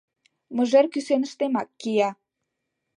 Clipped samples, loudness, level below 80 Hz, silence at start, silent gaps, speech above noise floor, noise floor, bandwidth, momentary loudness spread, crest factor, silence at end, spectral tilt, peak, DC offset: under 0.1%; -24 LUFS; -82 dBFS; 0.5 s; none; 58 dB; -81 dBFS; 10.5 kHz; 8 LU; 18 dB; 0.85 s; -5 dB/octave; -6 dBFS; under 0.1%